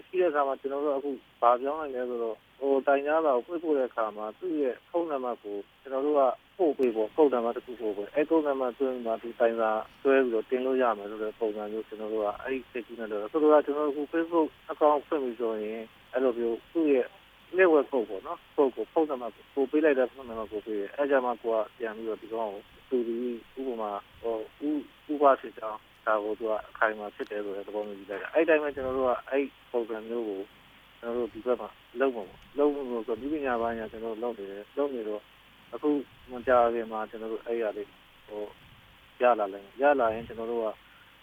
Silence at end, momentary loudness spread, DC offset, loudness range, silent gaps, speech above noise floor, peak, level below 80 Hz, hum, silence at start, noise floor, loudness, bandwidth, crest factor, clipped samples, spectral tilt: 0.5 s; 12 LU; under 0.1%; 5 LU; none; 27 dB; -8 dBFS; -64 dBFS; none; 0.15 s; -55 dBFS; -29 LUFS; 14.5 kHz; 20 dB; under 0.1%; -6.5 dB/octave